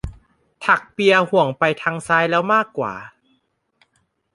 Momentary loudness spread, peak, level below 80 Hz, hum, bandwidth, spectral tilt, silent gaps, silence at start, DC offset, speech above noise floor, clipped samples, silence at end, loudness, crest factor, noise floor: 11 LU; -2 dBFS; -46 dBFS; none; 11.5 kHz; -5 dB/octave; none; 0.05 s; under 0.1%; 49 dB; under 0.1%; 1.25 s; -18 LUFS; 20 dB; -67 dBFS